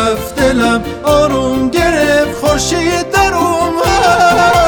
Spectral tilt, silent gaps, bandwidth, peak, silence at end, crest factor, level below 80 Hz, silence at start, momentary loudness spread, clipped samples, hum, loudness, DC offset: -4 dB/octave; none; over 20 kHz; 0 dBFS; 0 s; 10 dB; -28 dBFS; 0 s; 5 LU; under 0.1%; none; -11 LUFS; under 0.1%